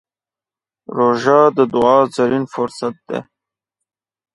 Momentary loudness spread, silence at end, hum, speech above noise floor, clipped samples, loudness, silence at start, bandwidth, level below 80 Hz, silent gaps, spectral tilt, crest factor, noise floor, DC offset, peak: 15 LU; 1.1 s; none; over 75 dB; under 0.1%; -15 LUFS; 0.9 s; 11.5 kHz; -58 dBFS; none; -6.5 dB/octave; 18 dB; under -90 dBFS; under 0.1%; 0 dBFS